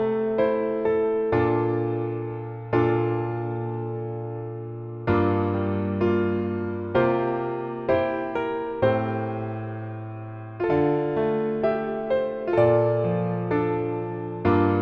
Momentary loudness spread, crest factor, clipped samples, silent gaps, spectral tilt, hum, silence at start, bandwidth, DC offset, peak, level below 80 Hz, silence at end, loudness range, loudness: 11 LU; 16 dB; under 0.1%; none; -10.5 dB/octave; none; 0 s; 5.4 kHz; under 0.1%; -8 dBFS; -54 dBFS; 0 s; 3 LU; -25 LUFS